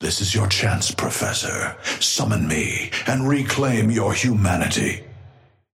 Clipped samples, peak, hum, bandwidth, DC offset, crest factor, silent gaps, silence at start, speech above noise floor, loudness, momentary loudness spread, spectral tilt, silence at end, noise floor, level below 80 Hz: under 0.1%; -4 dBFS; none; 16 kHz; under 0.1%; 18 dB; none; 0 s; 28 dB; -20 LUFS; 4 LU; -4 dB/octave; 0.45 s; -49 dBFS; -46 dBFS